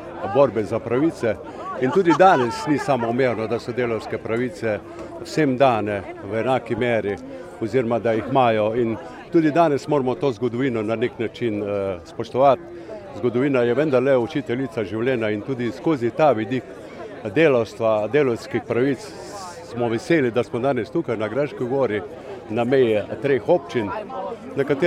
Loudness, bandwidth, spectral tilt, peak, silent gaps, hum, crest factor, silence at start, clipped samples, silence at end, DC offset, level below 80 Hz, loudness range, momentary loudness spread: -21 LUFS; 13 kHz; -7 dB/octave; -2 dBFS; none; none; 20 dB; 0 s; under 0.1%; 0 s; under 0.1%; -56 dBFS; 3 LU; 12 LU